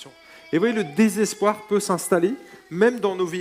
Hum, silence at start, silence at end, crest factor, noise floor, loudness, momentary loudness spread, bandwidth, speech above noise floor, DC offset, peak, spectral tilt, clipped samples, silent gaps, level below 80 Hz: none; 0 s; 0 s; 18 dB; -45 dBFS; -22 LUFS; 6 LU; 16 kHz; 24 dB; under 0.1%; -4 dBFS; -5 dB/octave; under 0.1%; none; -68 dBFS